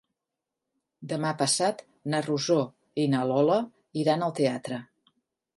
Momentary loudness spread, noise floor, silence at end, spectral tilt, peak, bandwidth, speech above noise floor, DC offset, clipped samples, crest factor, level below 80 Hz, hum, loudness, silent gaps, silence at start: 12 LU; -87 dBFS; 0.75 s; -4.5 dB/octave; -10 dBFS; 11.5 kHz; 61 dB; under 0.1%; under 0.1%; 18 dB; -76 dBFS; none; -27 LUFS; none; 1 s